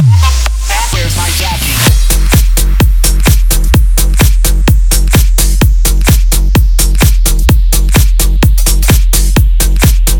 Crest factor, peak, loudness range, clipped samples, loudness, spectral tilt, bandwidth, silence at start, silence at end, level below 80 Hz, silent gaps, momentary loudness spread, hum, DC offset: 6 dB; 0 dBFS; 1 LU; 0.2%; -9 LUFS; -4 dB/octave; over 20 kHz; 0 s; 0 s; -8 dBFS; none; 3 LU; none; under 0.1%